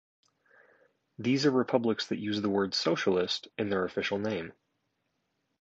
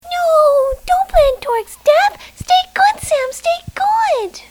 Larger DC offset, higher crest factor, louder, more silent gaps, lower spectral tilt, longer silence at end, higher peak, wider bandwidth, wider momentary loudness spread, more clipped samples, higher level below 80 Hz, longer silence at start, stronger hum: neither; first, 22 dB vs 14 dB; second, -30 LUFS vs -15 LUFS; neither; first, -5 dB/octave vs -2 dB/octave; first, 1.1 s vs 0.1 s; second, -10 dBFS vs 0 dBFS; second, 8 kHz vs 20 kHz; about the same, 7 LU vs 8 LU; neither; second, -68 dBFS vs -32 dBFS; first, 1.2 s vs 0.05 s; neither